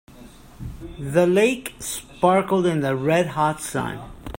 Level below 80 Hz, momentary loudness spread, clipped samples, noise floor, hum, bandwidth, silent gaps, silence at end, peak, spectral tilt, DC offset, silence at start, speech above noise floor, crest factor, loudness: -46 dBFS; 18 LU; under 0.1%; -45 dBFS; none; 16.5 kHz; none; 0 s; -2 dBFS; -5.5 dB/octave; under 0.1%; 0.1 s; 23 dB; 20 dB; -21 LUFS